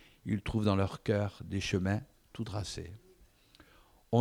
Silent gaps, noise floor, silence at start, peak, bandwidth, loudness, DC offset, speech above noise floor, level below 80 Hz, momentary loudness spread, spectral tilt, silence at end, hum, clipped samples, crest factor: none; -63 dBFS; 0.25 s; -14 dBFS; 13 kHz; -34 LUFS; under 0.1%; 29 dB; -56 dBFS; 13 LU; -6.5 dB/octave; 0 s; none; under 0.1%; 20 dB